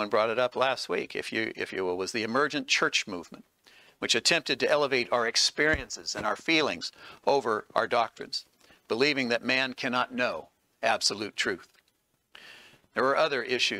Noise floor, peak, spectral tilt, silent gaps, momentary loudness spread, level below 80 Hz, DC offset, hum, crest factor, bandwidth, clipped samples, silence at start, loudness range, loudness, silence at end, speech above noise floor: -73 dBFS; -6 dBFS; -2 dB/octave; none; 10 LU; -58 dBFS; under 0.1%; none; 22 dB; 16 kHz; under 0.1%; 0 s; 4 LU; -27 LUFS; 0 s; 45 dB